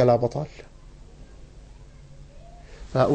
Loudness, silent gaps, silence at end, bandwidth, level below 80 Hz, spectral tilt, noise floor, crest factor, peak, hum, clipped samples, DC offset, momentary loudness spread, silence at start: -25 LUFS; none; 0 s; 9 kHz; -46 dBFS; -8 dB/octave; -46 dBFS; 20 dB; -8 dBFS; none; under 0.1%; under 0.1%; 26 LU; 0 s